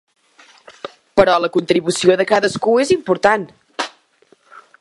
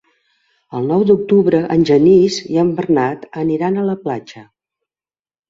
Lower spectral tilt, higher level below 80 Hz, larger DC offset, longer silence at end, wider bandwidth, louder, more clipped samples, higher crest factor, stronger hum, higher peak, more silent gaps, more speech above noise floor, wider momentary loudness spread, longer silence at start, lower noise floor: second, -4.5 dB/octave vs -7 dB/octave; about the same, -54 dBFS vs -54 dBFS; neither; second, 0.2 s vs 1.05 s; first, 11.5 kHz vs 7.8 kHz; about the same, -16 LUFS vs -15 LUFS; neither; about the same, 18 dB vs 14 dB; neither; about the same, 0 dBFS vs -2 dBFS; neither; second, 40 dB vs over 76 dB; first, 16 LU vs 12 LU; first, 0.85 s vs 0.7 s; second, -55 dBFS vs under -90 dBFS